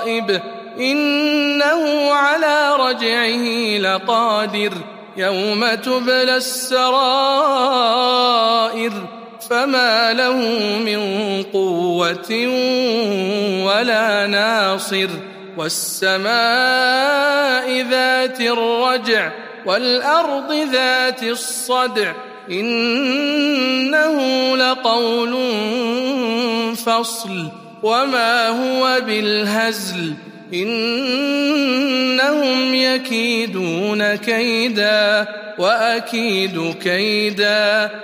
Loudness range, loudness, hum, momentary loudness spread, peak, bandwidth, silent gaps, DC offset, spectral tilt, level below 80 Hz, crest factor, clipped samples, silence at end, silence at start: 2 LU; -16 LUFS; none; 7 LU; -2 dBFS; 15.5 kHz; none; under 0.1%; -3 dB/octave; -72 dBFS; 16 dB; under 0.1%; 0 s; 0 s